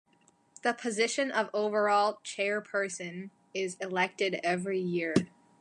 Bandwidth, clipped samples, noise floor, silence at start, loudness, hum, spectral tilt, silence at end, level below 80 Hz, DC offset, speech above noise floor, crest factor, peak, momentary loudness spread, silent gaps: 11.5 kHz; under 0.1%; -67 dBFS; 0.65 s; -31 LUFS; none; -4 dB/octave; 0.35 s; -74 dBFS; under 0.1%; 36 dB; 22 dB; -10 dBFS; 9 LU; none